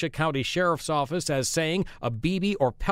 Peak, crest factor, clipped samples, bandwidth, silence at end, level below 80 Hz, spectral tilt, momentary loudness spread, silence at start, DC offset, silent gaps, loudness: -10 dBFS; 18 dB; under 0.1%; 16 kHz; 0 s; -44 dBFS; -4.5 dB/octave; 3 LU; 0 s; under 0.1%; none; -26 LUFS